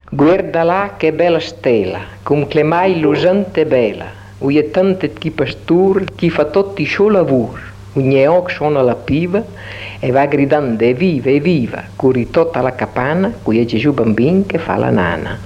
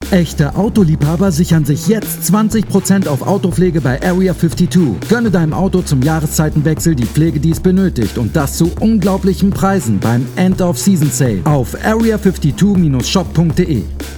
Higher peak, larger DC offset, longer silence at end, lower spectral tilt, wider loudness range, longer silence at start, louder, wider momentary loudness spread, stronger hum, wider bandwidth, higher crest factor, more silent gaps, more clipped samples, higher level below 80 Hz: about the same, -2 dBFS vs 0 dBFS; neither; about the same, 0 s vs 0 s; first, -8 dB/octave vs -6.5 dB/octave; about the same, 1 LU vs 1 LU; about the same, 0.1 s vs 0 s; about the same, -14 LUFS vs -13 LUFS; first, 8 LU vs 3 LU; neither; second, 9.8 kHz vs 19.5 kHz; about the same, 12 dB vs 12 dB; neither; neither; second, -42 dBFS vs -28 dBFS